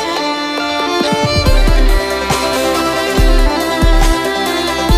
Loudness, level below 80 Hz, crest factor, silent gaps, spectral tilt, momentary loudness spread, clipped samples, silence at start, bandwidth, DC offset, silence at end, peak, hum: -14 LUFS; -14 dBFS; 12 dB; none; -4.5 dB/octave; 3 LU; under 0.1%; 0 s; 15.5 kHz; under 0.1%; 0 s; 0 dBFS; none